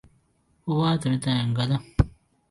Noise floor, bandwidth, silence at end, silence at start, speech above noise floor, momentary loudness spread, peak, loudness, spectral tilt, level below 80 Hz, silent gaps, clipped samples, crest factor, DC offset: -66 dBFS; 11.5 kHz; 0.4 s; 0.65 s; 42 dB; 5 LU; -4 dBFS; -25 LUFS; -6.5 dB/octave; -38 dBFS; none; under 0.1%; 22 dB; under 0.1%